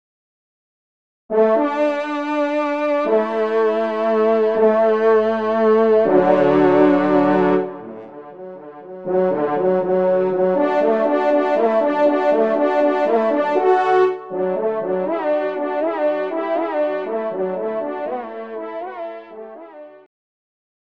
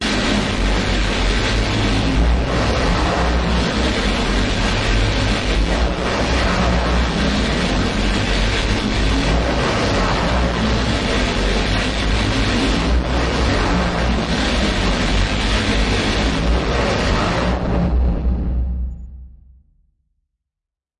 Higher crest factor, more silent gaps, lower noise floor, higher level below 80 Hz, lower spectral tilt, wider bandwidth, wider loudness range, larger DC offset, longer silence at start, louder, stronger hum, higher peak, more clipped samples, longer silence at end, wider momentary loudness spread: about the same, 16 dB vs 12 dB; neither; second, -39 dBFS vs -86 dBFS; second, -58 dBFS vs -22 dBFS; first, -8 dB/octave vs -5 dB/octave; second, 7.4 kHz vs 11 kHz; first, 8 LU vs 1 LU; first, 0.3% vs under 0.1%; first, 1.3 s vs 0 s; about the same, -18 LUFS vs -18 LUFS; neither; first, -2 dBFS vs -6 dBFS; neither; second, 0.85 s vs 1.7 s; first, 15 LU vs 2 LU